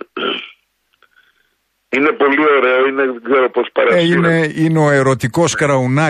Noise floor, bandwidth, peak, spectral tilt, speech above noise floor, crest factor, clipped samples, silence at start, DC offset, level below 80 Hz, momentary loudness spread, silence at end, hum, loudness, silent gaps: -65 dBFS; 13.5 kHz; -2 dBFS; -5.5 dB/octave; 52 dB; 14 dB; under 0.1%; 0.15 s; under 0.1%; -54 dBFS; 8 LU; 0 s; none; -14 LUFS; none